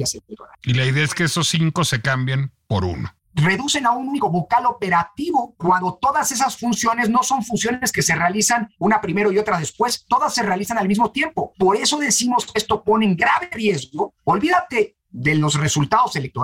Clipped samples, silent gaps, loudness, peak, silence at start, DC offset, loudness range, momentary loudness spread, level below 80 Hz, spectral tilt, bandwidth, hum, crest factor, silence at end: under 0.1%; none; -19 LUFS; -6 dBFS; 0 s; under 0.1%; 2 LU; 6 LU; -50 dBFS; -4 dB/octave; 17 kHz; none; 14 dB; 0 s